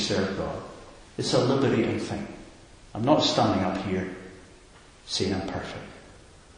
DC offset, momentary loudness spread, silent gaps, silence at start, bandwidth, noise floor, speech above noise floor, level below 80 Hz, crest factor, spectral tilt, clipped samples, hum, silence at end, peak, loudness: under 0.1%; 21 LU; none; 0 s; 10.5 kHz; -52 dBFS; 26 dB; -50 dBFS; 22 dB; -5 dB/octave; under 0.1%; none; 0.4 s; -6 dBFS; -26 LUFS